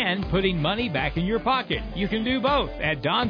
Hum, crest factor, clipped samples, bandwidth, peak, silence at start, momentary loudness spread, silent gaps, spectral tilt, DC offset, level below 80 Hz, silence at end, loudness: none; 14 dB; under 0.1%; 5.2 kHz; -10 dBFS; 0 s; 4 LU; none; -8 dB/octave; under 0.1%; -38 dBFS; 0 s; -24 LUFS